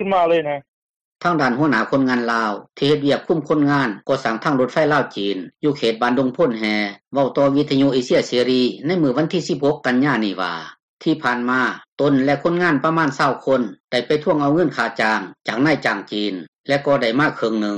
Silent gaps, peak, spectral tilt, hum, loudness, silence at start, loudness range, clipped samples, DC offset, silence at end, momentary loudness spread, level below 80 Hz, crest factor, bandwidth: 0.68-1.16 s, 10.83-10.97 s, 11.88-11.97 s, 13.80-13.88 s, 16.48-16.64 s; -6 dBFS; -6 dB/octave; none; -19 LUFS; 0 s; 1 LU; under 0.1%; under 0.1%; 0 s; 7 LU; -58 dBFS; 12 dB; 9.8 kHz